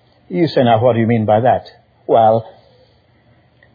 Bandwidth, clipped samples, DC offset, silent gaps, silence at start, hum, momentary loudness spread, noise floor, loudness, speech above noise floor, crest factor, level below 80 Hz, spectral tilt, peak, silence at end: 5 kHz; under 0.1%; under 0.1%; none; 0.3 s; none; 8 LU; -52 dBFS; -14 LUFS; 39 dB; 14 dB; -56 dBFS; -9.5 dB/octave; -2 dBFS; 1.25 s